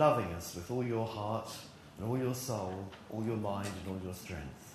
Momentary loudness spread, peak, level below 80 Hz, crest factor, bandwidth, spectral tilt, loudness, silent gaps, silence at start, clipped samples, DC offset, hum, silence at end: 10 LU; -14 dBFS; -60 dBFS; 22 dB; 13.5 kHz; -6 dB/octave; -38 LUFS; none; 0 s; under 0.1%; under 0.1%; none; 0 s